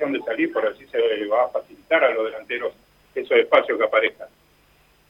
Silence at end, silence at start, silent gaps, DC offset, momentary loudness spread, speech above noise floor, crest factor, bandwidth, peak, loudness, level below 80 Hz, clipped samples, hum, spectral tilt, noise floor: 0.8 s; 0 s; none; under 0.1%; 10 LU; 37 dB; 20 dB; 5.4 kHz; -2 dBFS; -22 LUFS; -66 dBFS; under 0.1%; 50 Hz at -65 dBFS; -5 dB/octave; -58 dBFS